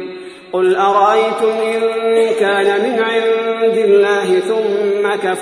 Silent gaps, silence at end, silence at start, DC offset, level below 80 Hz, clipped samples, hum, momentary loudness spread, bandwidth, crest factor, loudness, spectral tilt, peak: none; 0 s; 0 s; under 0.1%; -62 dBFS; under 0.1%; none; 5 LU; 11 kHz; 12 dB; -14 LUFS; -4.5 dB/octave; -2 dBFS